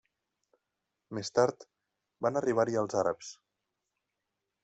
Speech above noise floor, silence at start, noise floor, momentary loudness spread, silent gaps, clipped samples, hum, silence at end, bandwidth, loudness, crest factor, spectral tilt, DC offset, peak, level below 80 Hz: 56 dB; 1.1 s; -86 dBFS; 13 LU; none; under 0.1%; none; 1.3 s; 8.2 kHz; -31 LUFS; 22 dB; -5 dB/octave; under 0.1%; -14 dBFS; -74 dBFS